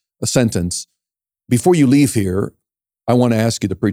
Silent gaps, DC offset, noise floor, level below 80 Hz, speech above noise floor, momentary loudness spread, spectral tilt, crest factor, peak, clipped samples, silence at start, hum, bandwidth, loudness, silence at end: none; under 0.1%; -87 dBFS; -52 dBFS; 72 dB; 11 LU; -5.5 dB/octave; 16 dB; 0 dBFS; under 0.1%; 0.2 s; none; 16 kHz; -16 LUFS; 0 s